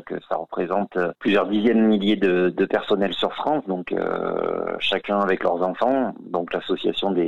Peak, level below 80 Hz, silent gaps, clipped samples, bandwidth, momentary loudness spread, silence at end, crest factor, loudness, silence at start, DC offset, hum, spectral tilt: -6 dBFS; -60 dBFS; none; under 0.1%; 7.6 kHz; 7 LU; 0 s; 16 dB; -22 LUFS; 0 s; 0.4%; none; -7 dB/octave